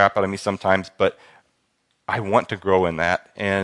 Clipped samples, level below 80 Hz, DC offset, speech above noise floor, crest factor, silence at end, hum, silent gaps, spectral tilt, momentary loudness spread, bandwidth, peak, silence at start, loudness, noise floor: under 0.1%; -58 dBFS; under 0.1%; 48 dB; 22 dB; 0 s; none; none; -5.5 dB/octave; 6 LU; 11.5 kHz; 0 dBFS; 0 s; -22 LUFS; -69 dBFS